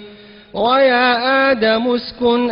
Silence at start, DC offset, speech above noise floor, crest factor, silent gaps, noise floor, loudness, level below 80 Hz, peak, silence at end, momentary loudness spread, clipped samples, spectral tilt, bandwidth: 0 s; under 0.1%; 25 dB; 12 dB; none; -40 dBFS; -14 LUFS; -52 dBFS; -4 dBFS; 0 s; 7 LU; under 0.1%; -7.5 dB/octave; 5.6 kHz